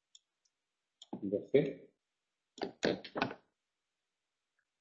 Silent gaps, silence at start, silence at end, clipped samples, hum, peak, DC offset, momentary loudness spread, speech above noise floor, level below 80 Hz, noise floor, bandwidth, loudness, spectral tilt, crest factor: none; 1.15 s; 1.45 s; under 0.1%; none; -14 dBFS; under 0.1%; 18 LU; 55 dB; -76 dBFS; -90 dBFS; 7.6 kHz; -37 LUFS; -4.5 dB/octave; 26 dB